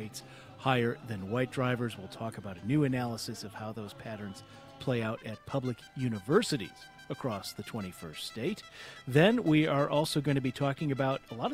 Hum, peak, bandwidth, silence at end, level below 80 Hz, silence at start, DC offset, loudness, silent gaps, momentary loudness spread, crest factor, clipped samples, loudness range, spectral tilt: none; -10 dBFS; 16 kHz; 0 s; -64 dBFS; 0 s; under 0.1%; -32 LUFS; none; 16 LU; 22 dB; under 0.1%; 6 LU; -6 dB/octave